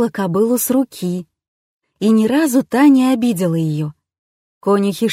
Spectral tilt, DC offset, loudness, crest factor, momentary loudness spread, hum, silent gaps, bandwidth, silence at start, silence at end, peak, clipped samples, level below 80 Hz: -6 dB/octave; under 0.1%; -16 LUFS; 14 dB; 12 LU; none; 1.48-1.80 s, 4.18-4.61 s; 16 kHz; 0 s; 0 s; -2 dBFS; under 0.1%; -60 dBFS